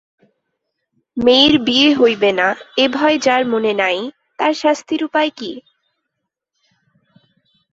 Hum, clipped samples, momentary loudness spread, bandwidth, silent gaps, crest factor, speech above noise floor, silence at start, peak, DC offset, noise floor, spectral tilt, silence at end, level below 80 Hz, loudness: none; under 0.1%; 14 LU; 8 kHz; none; 18 dB; 62 dB; 1.15 s; 0 dBFS; under 0.1%; -77 dBFS; -3.5 dB/octave; 2.15 s; -54 dBFS; -15 LUFS